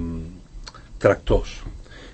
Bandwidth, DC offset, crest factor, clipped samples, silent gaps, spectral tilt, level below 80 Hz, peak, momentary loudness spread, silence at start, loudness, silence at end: 8.6 kHz; under 0.1%; 22 dB; under 0.1%; none; -6.5 dB/octave; -32 dBFS; -2 dBFS; 21 LU; 0 s; -22 LUFS; 0 s